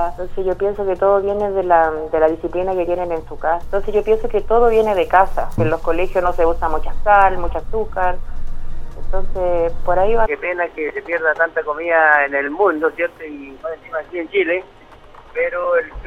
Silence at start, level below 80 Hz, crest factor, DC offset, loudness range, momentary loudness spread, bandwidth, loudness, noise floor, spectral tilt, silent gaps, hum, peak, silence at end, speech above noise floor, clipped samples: 0 s; -26 dBFS; 16 dB; under 0.1%; 4 LU; 13 LU; 3.9 kHz; -18 LUFS; -41 dBFS; -7 dB/octave; none; none; 0 dBFS; 0 s; 25 dB; under 0.1%